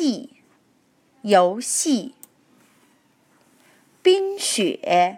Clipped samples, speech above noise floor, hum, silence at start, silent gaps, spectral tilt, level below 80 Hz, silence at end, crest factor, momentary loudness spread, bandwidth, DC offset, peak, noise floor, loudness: under 0.1%; 42 dB; none; 0 s; none; -3 dB/octave; -82 dBFS; 0 s; 20 dB; 12 LU; 16 kHz; under 0.1%; -2 dBFS; -62 dBFS; -20 LUFS